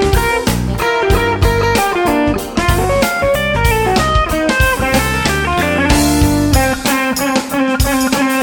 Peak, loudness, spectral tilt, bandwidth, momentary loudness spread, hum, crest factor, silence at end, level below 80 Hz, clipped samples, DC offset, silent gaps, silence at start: 0 dBFS; -13 LUFS; -4.5 dB/octave; 17.5 kHz; 3 LU; none; 12 dB; 0 s; -22 dBFS; under 0.1%; under 0.1%; none; 0 s